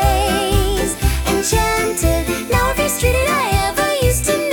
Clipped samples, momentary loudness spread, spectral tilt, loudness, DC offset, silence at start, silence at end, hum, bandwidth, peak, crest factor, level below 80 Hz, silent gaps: under 0.1%; 2 LU; -4 dB/octave; -17 LUFS; under 0.1%; 0 s; 0 s; none; 19 kHz; -2 dBFS; 14 dB; -22 dBFS; none